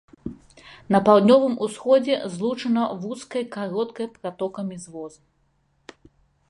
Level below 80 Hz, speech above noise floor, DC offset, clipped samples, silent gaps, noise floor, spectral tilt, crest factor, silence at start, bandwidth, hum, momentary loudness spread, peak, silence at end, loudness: -60 dBFS; 45 dB; under 0.1%; under 0.1%; none; -66 dBFS; -6 dB/octave; 20 dB; 0.25 s; 11.5 kHz; none; 21 LU; -4 dBFS; 1.4 s; -22 LUFS